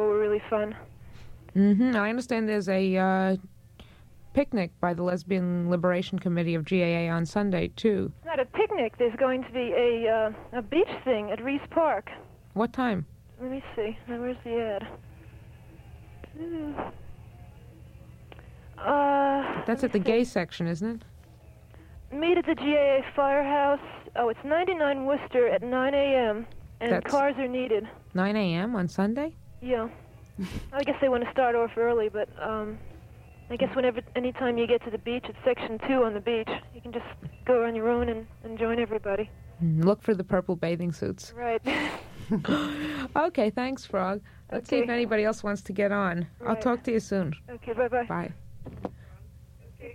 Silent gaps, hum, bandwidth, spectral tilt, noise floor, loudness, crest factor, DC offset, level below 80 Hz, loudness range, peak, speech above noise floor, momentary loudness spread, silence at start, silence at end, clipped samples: none; none; 13 kHz; -7 dB/octave; -51 dBFS; -28 LUFS; 16 dB; under 0.1%; -52 dBFS; 5 LU; -12 dBFS; 24 dB; 12 LU; 0 s; 0 s; under 0.1%